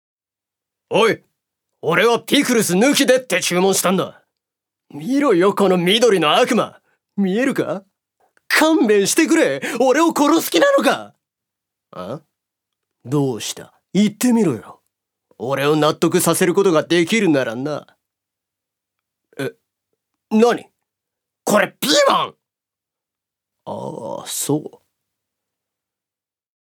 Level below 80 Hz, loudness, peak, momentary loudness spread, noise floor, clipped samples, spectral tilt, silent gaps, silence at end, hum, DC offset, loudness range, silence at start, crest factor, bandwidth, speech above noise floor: -74 dBFS; -17 LUFS; 0 dBFS; 15 LU; -90 dBFS; under 0.1%; -4 dB/octave; none; 2 s; none; under 0.1%; 8 LU; 0.9 s; 18 dB; over 20 kHz; 73 dB